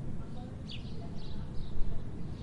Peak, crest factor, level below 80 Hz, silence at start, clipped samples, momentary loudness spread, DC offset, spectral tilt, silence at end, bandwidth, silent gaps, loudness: -14 dBFS; 18 dB; -40 dBFS; 0 s; under 0.1%; 2 LU; under 0.1%; -7.5 dB/octave; 0 s; 5.4 kHz; none; -43 LUFS